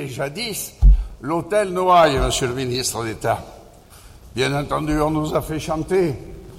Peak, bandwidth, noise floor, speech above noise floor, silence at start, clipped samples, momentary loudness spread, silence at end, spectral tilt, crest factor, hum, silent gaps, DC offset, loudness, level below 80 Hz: -4 dBFS; 16 kHz; -44 dBFS; 24 dB; 0 s; under 0.1%; 10 LU; 0 s; -5 dB/octave; 16 dB; none; none; under 0.1%; -20 LUFS; -24 dBFS